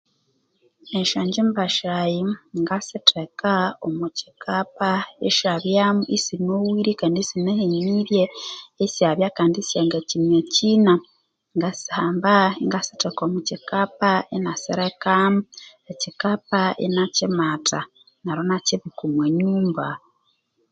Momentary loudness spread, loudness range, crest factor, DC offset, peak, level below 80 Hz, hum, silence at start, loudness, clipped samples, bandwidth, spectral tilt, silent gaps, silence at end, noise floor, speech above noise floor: 10 LU; 3 LU; 22 dB; under 0.1%; 0 dBFS; -66 dBFS; none; 0.85 s; -21 LUFS; under 0.1%; 9 kHz; -4.5 dB/octave; none; 0.75 s; -68 dBFS; 47 dB